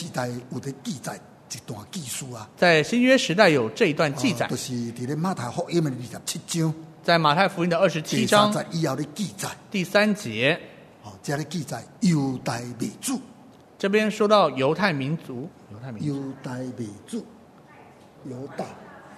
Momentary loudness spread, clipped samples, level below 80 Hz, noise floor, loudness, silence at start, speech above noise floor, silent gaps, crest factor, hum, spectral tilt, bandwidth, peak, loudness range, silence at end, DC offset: 17 LU; under 0.1%; -66 dBFS; -49 dBFS; -24 LUFS; 0 s; 25 dB; none; 22 dB; none; -5 dB/octave; 13.5 kHz; -2 dBFS; 7 LU; 0 s; under 0.1%